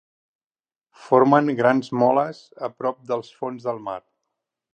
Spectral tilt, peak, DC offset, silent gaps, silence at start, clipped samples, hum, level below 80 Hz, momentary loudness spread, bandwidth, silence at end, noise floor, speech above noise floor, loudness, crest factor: -7.5 dB/octave; -2 dBFS; under 0.1%; none; 1 s; under 0.1%; none; -74 dBFS; 16 LU; 9 kHz; 0.75 s; under -90 dBFS; over 69 dB; -21 LUFS; 20 dB